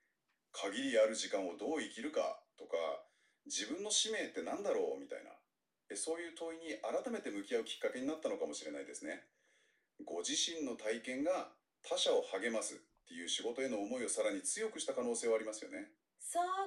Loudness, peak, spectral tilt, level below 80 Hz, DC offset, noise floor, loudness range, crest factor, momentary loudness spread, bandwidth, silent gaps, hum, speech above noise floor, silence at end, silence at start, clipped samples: -39 LUFS; -20 dBFS; -1 dB/octave; -86 dBFS; under 0.1%; -85 dBFS; 4 LU; 20 dB; 14 LU; 13 kHz; none; none; 46 dB; 0 s; 0.55 s; under 0.1%